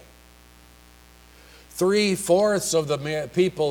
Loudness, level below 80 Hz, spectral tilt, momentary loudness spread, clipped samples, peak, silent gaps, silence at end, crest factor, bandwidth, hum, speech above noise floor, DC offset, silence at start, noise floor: -22 LUFS; -54 dBFS; -4.5 dB/octave; 7 LU; under 0.1%; -8 dBFS; none; 0 s; 18 dB; 19.5 kHz; 60 Hz at -50 dBFS; 29 dB; under 0.1%; 1.75 s; -51 dBFS